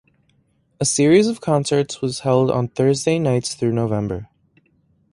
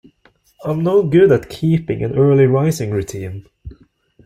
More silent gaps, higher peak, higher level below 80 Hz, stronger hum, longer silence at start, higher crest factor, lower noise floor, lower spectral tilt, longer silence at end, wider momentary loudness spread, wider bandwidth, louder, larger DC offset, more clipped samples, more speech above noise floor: neither; about the same, -2 dBFS vs -2 dBFS; second, -52 dBFS vs -46 dBFS; neither; first, 0.8 s vs 0.6 s; about the same, 18 dB vs 14 dB; first, -62 dBFS vs -55 dBFS; second, -5.5 dB/octave vs -7.5 dB/octave; first, 0.9 s vs 0.5 s; second, 9 LU vs 17 LU; second, 11.5 kHz vs 15 kHz; second, -19 LUFS vs -15 LUFS; neither; neither; about the same, 44 dB vs 41 dB